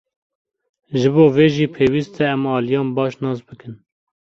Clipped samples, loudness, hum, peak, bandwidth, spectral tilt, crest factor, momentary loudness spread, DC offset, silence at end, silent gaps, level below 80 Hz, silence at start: under 0.1%; -17 LUFS; none; -2 dBFS; 7.4 kHz; -7.5 dB/octave; 16 dB; 13 LU; under 0.1%; 0.55 s; none; -54 dBFS; 0.9 s